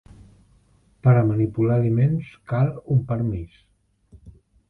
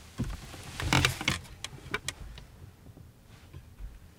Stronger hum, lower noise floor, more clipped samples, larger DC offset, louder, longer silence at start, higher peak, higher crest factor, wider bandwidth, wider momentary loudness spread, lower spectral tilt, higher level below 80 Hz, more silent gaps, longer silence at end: neither; first, -58 dBFS vs -53 dBFS; neither; neither; first, -22 LUFS vs -32 LUFS; first, 1.05 s vs 0 s; about the same, -6 dBFS vs -6 dBFS; second, 18 dB vs 30 dB; second, 3.7 kHz vs 18 kHz; second, 10 LU vs 26 LU; first, -11.5 dB/octave vs -3.5 dB/octave; about the same, -48 dBFS vs -46 dBFS; neither; first, 0.4 s vs 0.05 s